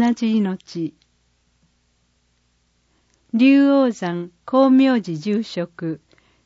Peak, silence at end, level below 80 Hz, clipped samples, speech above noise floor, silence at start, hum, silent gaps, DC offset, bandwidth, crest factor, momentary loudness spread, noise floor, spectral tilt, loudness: -4 dBFS; 0.5 s; -66 dBFS; under 0.1%; 46 dB; 0 s; 60 Hz at -50 dBFS; none; under 0.1%; 7.6 kHz; 16 dB; 16 LU; -64 dBFS; -7 dB/octave; -19 LUFS